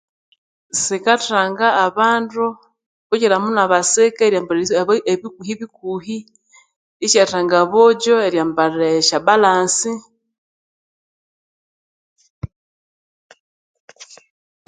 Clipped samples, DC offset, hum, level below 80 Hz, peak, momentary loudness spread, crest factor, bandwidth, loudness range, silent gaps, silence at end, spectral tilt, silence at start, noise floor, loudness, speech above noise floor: under 0.1%; under 0.1%; none; -56 dBFS; 0 dBFS; 15 LU; 18 dB; 9.6 kHz; 5 LU; 2.86-3.10 s, 6.76-7.00 s, 10.38-12.16 s, 12.30-12.42 s, 12.56-13.30 s, 13.40-13.74 s, 13.80-13.88 s; 0.65 s; -2.5 dB/octave; 0.75 s; under -90 dBFS; -16 LUFS; over 74 dB